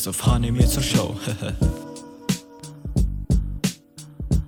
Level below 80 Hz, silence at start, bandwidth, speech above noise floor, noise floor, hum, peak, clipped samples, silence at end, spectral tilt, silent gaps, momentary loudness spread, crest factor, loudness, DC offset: -28 dBFS; 0 s; 19 kHz; 21 dB; -42 dBFS; none; -4 dBFS; under 0.1%; 0 s; -5 dB/octave; none; 17 LU; 18 dB; -24 LUFS; under 0.1%